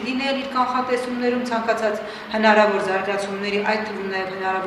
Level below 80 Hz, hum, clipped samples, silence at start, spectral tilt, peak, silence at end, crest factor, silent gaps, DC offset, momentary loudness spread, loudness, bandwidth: -60 dBFS; none; under 0.1%; 0 s; -4.5 dB/octave; -2 dBFS; 0 s; 20 dB; none; under 0.1%; 9 LU; -21 LUFS; 14.5 kHz